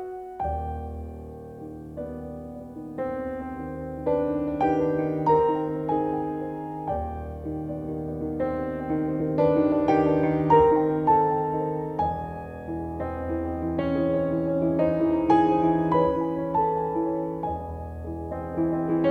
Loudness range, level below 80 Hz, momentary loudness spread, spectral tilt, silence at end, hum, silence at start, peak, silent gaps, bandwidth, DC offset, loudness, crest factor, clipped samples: 9 LU; -44 dBFS; 15 LU; -9.5 dB/octave; 0 s; none; 0 s; -6 dBFS; none; 6 kHz; under 0.1%; -26 LUFS; 18 dB; under 0.1%